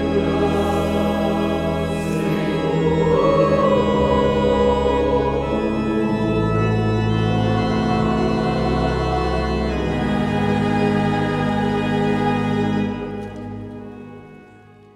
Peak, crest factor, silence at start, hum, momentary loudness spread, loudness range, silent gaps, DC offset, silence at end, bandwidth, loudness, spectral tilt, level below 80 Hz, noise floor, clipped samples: -4 dBFS; 14 dB; 0 s; none; 5 LU; 3 LU; none; under 0.1%; 0.5 s; 13 kHz; -19 LUFS; -7.5 dB/octave; -32 dBFS; -45 dBFS; under 0.1%